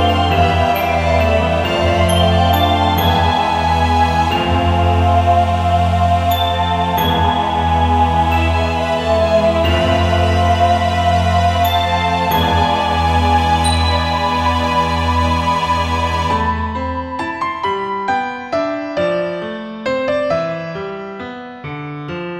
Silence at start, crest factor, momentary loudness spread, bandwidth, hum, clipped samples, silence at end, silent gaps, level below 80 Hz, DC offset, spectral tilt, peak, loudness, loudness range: 0 s; 14 dB; 9 LU; 14 kHz; none; under 0.1%; 0 s; none; -26 dBFS; under 0.1%; -6 dB/octave; -2 dBFS; -15 LUFS; 6 LU